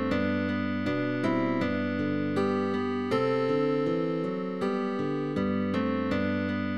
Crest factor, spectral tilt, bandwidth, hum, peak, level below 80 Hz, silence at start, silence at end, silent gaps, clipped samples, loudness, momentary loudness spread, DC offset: 14 dB; -8 dB/octave; 9.4 kHz; none; -14 dBFS; -60 dBFS; 0 s; 0 s; none; under 0.1%; -28 LUFS; 4 LU; 0.3%